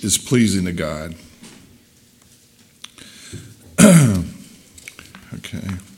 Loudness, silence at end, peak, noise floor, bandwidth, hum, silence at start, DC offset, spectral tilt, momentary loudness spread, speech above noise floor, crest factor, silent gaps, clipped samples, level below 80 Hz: -16 LUFS; 0.15 s; 0 dBFS; -52 dBFS; 17 kHz; none; 0 s; under 0.1%; -5 dB/octave; 28 LU; 31 dB; 20 dB; none; under 0.1%; -46 dBFS